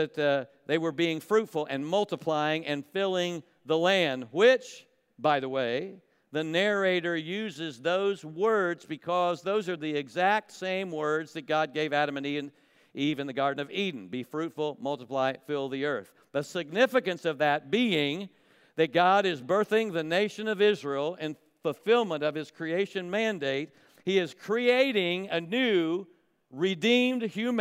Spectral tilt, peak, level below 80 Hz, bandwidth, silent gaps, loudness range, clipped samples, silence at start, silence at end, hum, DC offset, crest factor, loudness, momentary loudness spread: -5 dB/octave; -10 dBFS; -84 dBFS; 16 kHz; none; 4 LU; under 0.1%; 0 s; 0 s; none; under 0.1%; 18 dB; -28 LUFS; 11 LU